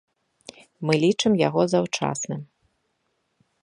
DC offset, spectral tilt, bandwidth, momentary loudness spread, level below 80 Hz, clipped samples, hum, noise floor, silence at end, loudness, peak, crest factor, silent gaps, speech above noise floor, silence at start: under 0.1%; -5 dB/octave; 11.5 kHz; 12 LU; -66 dBFS; under 0.1%; none; -73 dBFS; 1.2 s; -23 LUFS; -6 dBFS; 20 dB; none; 51 dB; 0.8 s